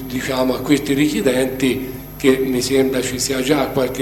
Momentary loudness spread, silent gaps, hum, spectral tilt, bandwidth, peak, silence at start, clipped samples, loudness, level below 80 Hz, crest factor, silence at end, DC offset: 4 LU; none; 50 Hz at -35 dBFS; -4.5 dB/octave; 17 kHz; 0 dBFS; 0 s; under 0.1%; -18 LUFS; -40 dBFS; 18 dB; 0 s; under 0.1%